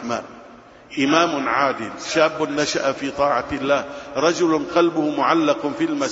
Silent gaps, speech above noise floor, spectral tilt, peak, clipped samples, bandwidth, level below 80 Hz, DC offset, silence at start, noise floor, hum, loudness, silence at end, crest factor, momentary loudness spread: none; 24 dB; -4 dB/octave; -2 dBFS; under 0.1%; 8 kHz; -54 dBFS; under 0.1%; 0 s; -44 dBFS; none; -20 LUFS; 0 s; 20 dB; 8 LU